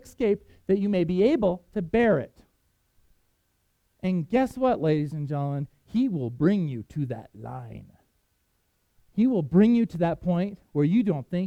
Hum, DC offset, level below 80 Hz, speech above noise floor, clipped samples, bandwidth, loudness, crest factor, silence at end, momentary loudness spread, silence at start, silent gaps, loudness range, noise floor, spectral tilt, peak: none; under 0.1%; -54 dBFS; 47 dB; under 0.1%; 10.5 kHz; -25 LUFS; 18 dB; 0 s; 13 LU; 0.05 s; none; 5 LU; -71 dBFS; -9 dB/octave; -8 dBFS